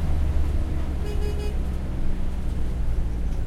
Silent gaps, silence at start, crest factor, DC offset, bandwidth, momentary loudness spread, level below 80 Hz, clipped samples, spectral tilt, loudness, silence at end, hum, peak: none; 0 s; 12 dB; under 0.1%; 11.5 kHz; 5 LU; -24 dBFS; under 0.1%; -7.5 dB/octave; -29 LUFS; 0 s; none; -10 dBFS